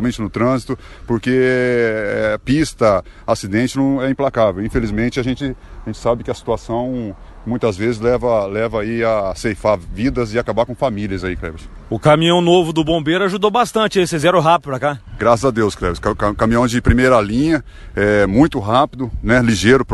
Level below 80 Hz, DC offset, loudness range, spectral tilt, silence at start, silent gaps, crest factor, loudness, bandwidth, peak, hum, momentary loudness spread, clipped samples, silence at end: -32 dBFS; under 0.1%; 5 LU; -6 dB/octave; 0 s; none; 16 dB; -17 LUFS; 12.5 kHz; 0 dBFS; none; 10 LU; under 0.1%; 0 s